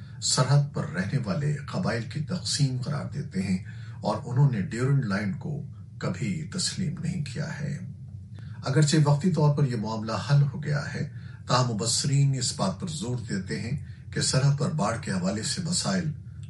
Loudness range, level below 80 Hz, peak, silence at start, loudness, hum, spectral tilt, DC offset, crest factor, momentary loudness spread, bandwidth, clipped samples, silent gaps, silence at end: 4 LU; -56 dBFS; -10 dBFS; 0 s; -27 LUFS; none; -5 dB/octave; under 0.1%; 18 dB; 11 LU; 11.5 kHz; under 0.1%; none; 0 s